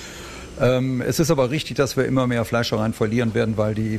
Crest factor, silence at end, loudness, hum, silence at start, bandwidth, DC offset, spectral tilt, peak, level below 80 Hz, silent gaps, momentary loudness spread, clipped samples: 14 dB; 0 s; -21 LUFS; none; 0 s; 15 kHz; under 0.1%; -6 dB/octave; -8 dBFS; -44 dBFS; none; 3 LU; under 0.1%